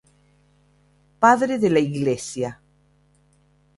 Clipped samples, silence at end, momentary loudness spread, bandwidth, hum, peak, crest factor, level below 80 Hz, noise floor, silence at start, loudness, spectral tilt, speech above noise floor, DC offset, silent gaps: under 0.1%; 1.25 s; 12 LU; 11.5 kHz; 50 Hz at -50 dBFS; -2 dBFS; 22 dB; -60 dBFS; -60 dBFS; 1.2 s; -20 LUFS; -5.5 dB/octave; 41 dB; under 0.1%; none